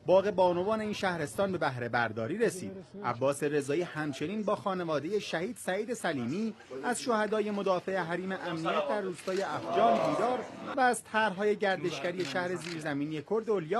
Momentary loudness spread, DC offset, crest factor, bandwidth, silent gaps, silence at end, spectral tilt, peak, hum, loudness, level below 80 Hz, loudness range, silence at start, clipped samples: 7 LU; under 0.1%; 18 dB; 12.5 kHz; none; 0 s; -5 dB/octave; -12 dBFS; none; -31 LUFS; -72 dBFS; 3 LU; 0.05 s; under 0.1%